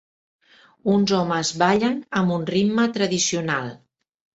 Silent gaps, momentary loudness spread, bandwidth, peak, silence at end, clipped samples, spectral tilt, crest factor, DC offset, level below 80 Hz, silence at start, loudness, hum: none; 6 LU; 8.2 kHz; -4 dBFS; 0.6 s; under 0.1%; -4.5 dB/octave; 18 dB; under 0.1%; -60 dBFS; 0.85 s; -21 LUFS; none